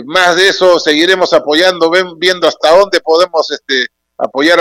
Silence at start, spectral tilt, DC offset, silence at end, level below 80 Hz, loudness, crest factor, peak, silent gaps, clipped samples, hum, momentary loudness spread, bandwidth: 0 s; -2.5 dB/octave; under 0.1%; 0 s; -52 dBFS; -10 LUFS; 10 dB; 0 dBFS; none; 0.6%; none; 6 LU; 16 kHz